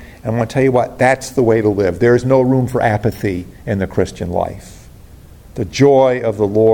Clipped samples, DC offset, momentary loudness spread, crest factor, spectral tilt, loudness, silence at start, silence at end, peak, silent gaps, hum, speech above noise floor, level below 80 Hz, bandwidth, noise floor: under 0.1%; under 0.1%; 11 LU; 14 dB; -7 dB/octave; -15 LUFS; 0 s; 0 s; 0 dBFS; none; none; 25 dB; -40 dBFS; 17.5 kHz; -39 dBFS